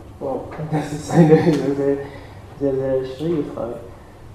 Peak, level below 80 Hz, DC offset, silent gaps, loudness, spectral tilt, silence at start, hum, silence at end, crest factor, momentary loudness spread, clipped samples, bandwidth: -2 dBFS; -46 dBFS; under 0.1%; none; -20 LUFS; -8 dB/octave; 0 s; none; 0 s; 18 dB; 21 LU; under 0.1%; 12 kHz